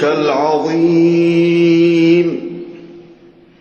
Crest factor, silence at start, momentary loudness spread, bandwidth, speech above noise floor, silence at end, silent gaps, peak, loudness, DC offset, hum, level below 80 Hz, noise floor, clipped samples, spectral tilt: 12 dB; 0 s; 15 LU; 7 kHz; 31 dB; 0.6 s; none; -2 dBFS; -12 LUFS; under 0.1%; none; -56 dBFS; -43 dBFS; under 0.1%; -7.5 dB/octave